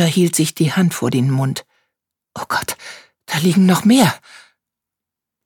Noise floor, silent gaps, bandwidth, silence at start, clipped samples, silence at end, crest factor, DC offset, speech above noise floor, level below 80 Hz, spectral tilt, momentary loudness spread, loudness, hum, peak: -84 dBFS; none; 19 kHz; 0 s; under 0.1%; 1.3 s; 16 dB; under 0.1%; 69 dB; -60 dBFS; -5 dB/octave; 19 LU; -16 LUFS; none; 0 dBFS